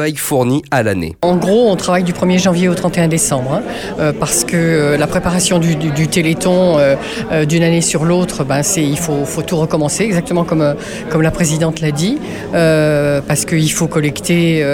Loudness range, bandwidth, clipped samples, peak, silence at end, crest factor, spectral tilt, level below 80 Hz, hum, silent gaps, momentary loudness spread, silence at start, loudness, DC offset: 2 LU; 16.5 kHz; under 0.1%; -2 dBFS; 0 s; 12 dB; -5 dB/octave; -38 dBFS; none; none; 5 LU; 0 s; -14 LUFS; under 0.1%